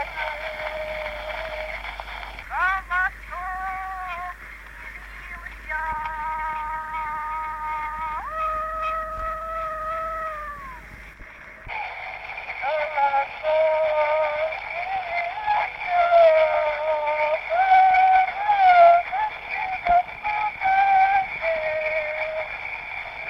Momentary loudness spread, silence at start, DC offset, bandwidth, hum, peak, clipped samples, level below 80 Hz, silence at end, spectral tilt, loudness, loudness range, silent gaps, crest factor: 18 LU; 0 s; under 0.1%; 11.5 kHz; none; -4 dBFS; under 0.1%; -46 dBFS; 0 s; -4 dB/octave; -23 LUFS; 12 LU; none; 18 dB